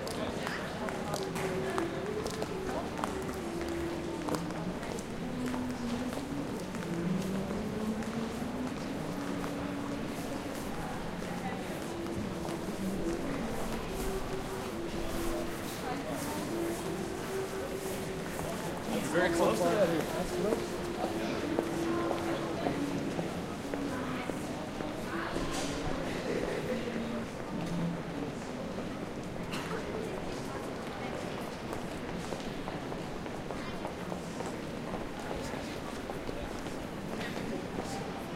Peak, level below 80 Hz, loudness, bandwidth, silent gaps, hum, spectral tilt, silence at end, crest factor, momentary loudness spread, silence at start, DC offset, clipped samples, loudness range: -12 dBFS; -50 dBFS; -36 LUFS; 16 kHz; none; none; -5 dB/octave; 0 s; 22 dB; 6 LU; 0 s; under 0.1%; under 0.1%; 7 LU